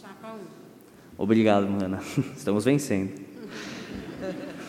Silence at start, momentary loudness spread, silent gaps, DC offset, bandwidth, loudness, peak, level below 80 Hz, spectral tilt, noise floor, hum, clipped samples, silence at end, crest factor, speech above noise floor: 0 s; 19 LU; none; under 0.1%; 16 kHz; -26 LUFS; -6 dBFS; -60 dBFS; -6 dB/octave; -50 dBFS; none; under 0.1%; 0 s; 22 dB; 25 dB